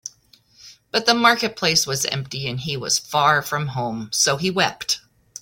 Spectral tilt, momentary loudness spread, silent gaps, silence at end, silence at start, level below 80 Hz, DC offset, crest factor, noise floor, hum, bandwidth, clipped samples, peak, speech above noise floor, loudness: -2.5 dB/octave; 10 LU; none; 0.4 s; 0.05 s; -58 dBFS; under 0.1%; 20 dB; -55 dBFS; none; 17 kHz; under 0.1%; -2 dBFS; 34 dB; -20 LUFS